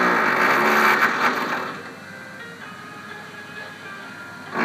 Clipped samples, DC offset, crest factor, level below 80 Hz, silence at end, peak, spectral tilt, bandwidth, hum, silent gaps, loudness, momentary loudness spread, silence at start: under 0.1%; under 0.1%; 20 dB; -76 dBFS; 0 s; -4 dBFS; -3.5 dB/octave; 15.5 kHz; none; none; -19 LUFS; 20 LU; 0 s